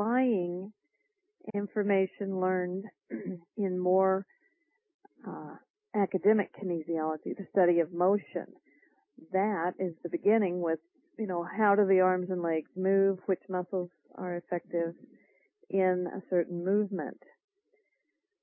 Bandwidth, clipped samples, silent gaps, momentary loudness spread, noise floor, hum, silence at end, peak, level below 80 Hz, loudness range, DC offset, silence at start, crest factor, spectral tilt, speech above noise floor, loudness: 3.3 kHz; under 0.1%; 4.94-4.99 s, 5.70-5.74 s; 13 LU; -82 dBFS; none; 1.3 s; -14 dBFS; -86 dBFS; 4 LU; under 0.1%; 0 s; 18 dB; -11.5 dB/octave; 52 dB; -30 LUFS